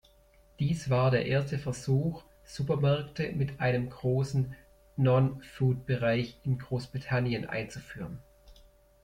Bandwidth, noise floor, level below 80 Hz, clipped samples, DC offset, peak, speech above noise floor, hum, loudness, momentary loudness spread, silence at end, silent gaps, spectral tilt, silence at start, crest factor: 10.5 kHz; -61 dBFS; -56 dBFS; under 0.1%; under 0.1%; -12 dBFS; 32 dB; none; -30 LUFS; 15 LU; 0.5 s; none; -7 dB/octave; 0.6 s; 18 dB